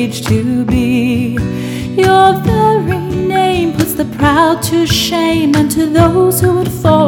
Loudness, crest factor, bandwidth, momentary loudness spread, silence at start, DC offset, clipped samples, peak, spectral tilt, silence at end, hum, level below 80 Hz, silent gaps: -12 LUFS; 12 dB; 18 kHz; 6 LU; 0 s; under 0.1%; 0.1%; 0 dBFS; -5.5 dB/octave; 0 s; none; -32 dBFS; none